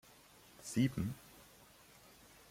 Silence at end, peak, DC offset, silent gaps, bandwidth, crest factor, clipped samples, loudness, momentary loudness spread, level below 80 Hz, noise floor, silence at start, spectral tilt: 1.1 s; -22 dBFS; under 0.1%; none; 16.5 kHz; 20 dB; under 0.1%; -39 LUFS; 25 LU; -66 dBFS; -63 dBFS; 0.6 s; -5.5 dB/octave